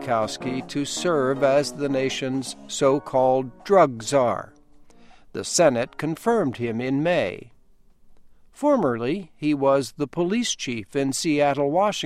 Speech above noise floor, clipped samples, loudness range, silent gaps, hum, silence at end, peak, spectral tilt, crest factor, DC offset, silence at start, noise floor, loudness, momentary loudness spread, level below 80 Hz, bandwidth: 31 dB; under 0.1%; 3 LU; none; none; 0 s; -4 dBFS; -4.5 dB/octave; 20 dB; under 0.1%; 0 s; -53 dBFS; -23 LUFS; 9 LU; -56 dBFS; 15 kHz